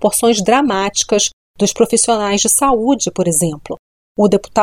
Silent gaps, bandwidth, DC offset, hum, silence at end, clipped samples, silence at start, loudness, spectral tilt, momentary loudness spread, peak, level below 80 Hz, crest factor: 1.33-1.54 s, 3.79-4.15 s; 16.5 kHz; under 0.1%; none; 0 s; under 0.1%; 0 s; -14 LUFS; -3.5 dB/octave; 8 LU; -2 dBFS; -44 dBFS; 14 dB